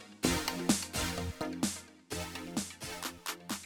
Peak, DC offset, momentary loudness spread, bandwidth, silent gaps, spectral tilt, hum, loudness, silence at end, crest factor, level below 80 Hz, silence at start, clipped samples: -16 dBFS; under 0.1%; 9 LU; over 20 kHz; none; -3 dB/octave; none; -36 LUFS; 0 s; 22 dB; -52 dBFS; 0 s; under 0.1%